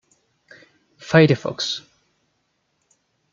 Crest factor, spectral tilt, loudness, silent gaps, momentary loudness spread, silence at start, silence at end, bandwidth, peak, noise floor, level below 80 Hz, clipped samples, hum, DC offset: 22 dB; -6 dB/octave; -19 LUFS; none; 15 LU; 1.05 s; 1.55 s; 7.6 kHz; -2 dBFS; -70 dBFS; -60 dBFS; under 0.1%; none; under 0.1%